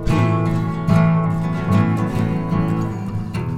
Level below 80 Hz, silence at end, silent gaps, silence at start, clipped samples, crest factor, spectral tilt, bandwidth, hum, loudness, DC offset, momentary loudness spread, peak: -34 dBFS; 0 s; none; 0 s; under 0.1%; 14 dB; -8.5 dB/octave; 10.5 kHz; none; -19 LUFS; under 0.1%; 8 LU; -4 dBFS